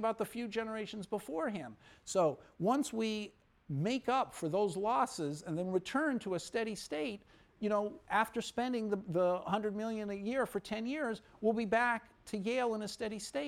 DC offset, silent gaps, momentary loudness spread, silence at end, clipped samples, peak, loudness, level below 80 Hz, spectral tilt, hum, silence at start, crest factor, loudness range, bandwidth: under 0.1%; none; 8 LU; 0 s; under 0.1%; -18 dBFS; -36 LUFS; -70 dBFS; -5 dB/octave; none; 0 s; 18 dB; 2 LU; 16 kHz